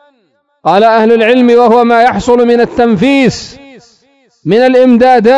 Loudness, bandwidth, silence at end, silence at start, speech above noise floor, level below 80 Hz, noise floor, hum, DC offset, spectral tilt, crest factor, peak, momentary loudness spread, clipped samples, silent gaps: -7 LUFS; 9.4 kHz; 0 s; 0.65 s; 50 dB; -42 dBFS; -56 dBFS; none; under 0.1%; -6 dB/octave; 8 dB; 0 dBFS; 7 LU; 3%; none